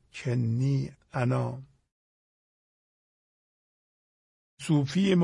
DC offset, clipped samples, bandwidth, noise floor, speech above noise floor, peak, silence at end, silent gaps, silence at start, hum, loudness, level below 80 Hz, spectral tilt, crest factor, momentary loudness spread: under 0.1%; under 0.1%; 11.5 kHz; under -90 dBFS; over 64 dB; -12 dBFS; 0 s; 1.92-4.57 s; 0.15 s; none; -29 LUFS; -64 dBFS; -7 dB/octave; 18 dB; 11 LU